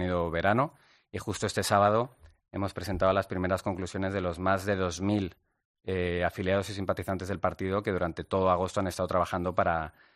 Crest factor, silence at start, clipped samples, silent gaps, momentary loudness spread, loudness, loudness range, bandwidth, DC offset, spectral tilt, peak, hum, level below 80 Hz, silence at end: 20 dB; 0 s; under 0.1%; 5.65-5.74 s; 8 LU; -30 LUFS; 2 LU; 14.5 kHz; under 0.1%; -5.5 dB/octave; -8 dBFS; none; -56 dBFS; 0.25 s